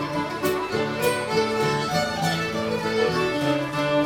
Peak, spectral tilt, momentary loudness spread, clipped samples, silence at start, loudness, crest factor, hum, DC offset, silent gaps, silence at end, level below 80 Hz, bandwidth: -8 dBFS; -4.5 dB/octave; 3 LU; under 0.1%; 0 s; -24 LUFS; 16 dB; none; under 0.1%; none; 0 s; -52 dBFS; 19 kHz